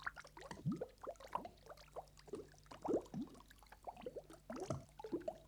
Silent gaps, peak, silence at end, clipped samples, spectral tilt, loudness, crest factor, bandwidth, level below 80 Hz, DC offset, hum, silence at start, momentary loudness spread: none; -26 dBFS; 0 s; under 0.1%; -6.5 dB/octave; -49 LUFS; 22 dB; over 20 kHz; -68 dBFS; under 0.1%; none; 0 s; 14 LU